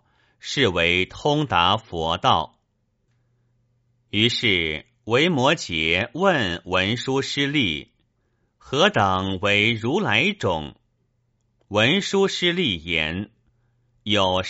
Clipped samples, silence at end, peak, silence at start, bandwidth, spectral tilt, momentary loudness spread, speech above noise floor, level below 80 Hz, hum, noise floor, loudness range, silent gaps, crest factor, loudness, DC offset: under 0.1%; 0 s; -2 dBFS; 0.45 s; 8 kHz; -2.5 dB/octave; 10 LU; 49 dB; -50 dBFS; none; -70 dBFS; 2 LU; none; 20 dB; -21 LUFS; under 0.1%